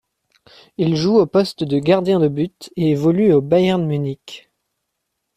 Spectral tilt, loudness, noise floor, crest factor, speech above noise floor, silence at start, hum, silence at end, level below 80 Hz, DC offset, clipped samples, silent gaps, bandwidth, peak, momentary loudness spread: -7.5 dB/octave; -17 LUFS; -76 dBFS; 16 dB; 59 dB; 0.8 s; none; 1 s; -56 dBFS; under 0.1%; under 0.1%; none; 13.5 kHz; -2 dBFS; 13 LU